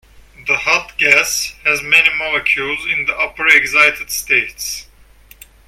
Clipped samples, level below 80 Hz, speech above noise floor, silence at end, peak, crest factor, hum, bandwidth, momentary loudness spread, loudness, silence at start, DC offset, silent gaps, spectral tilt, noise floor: under 0.1%; -46 dBFS; 29 dB; 0.85 s; 0 dBFS; 16 dB; none; 17.5 kHz; 12 LU; -13 LUFS; 0.4 s; under 0.1%; none; -0.5 dB/octave; -45 dBFS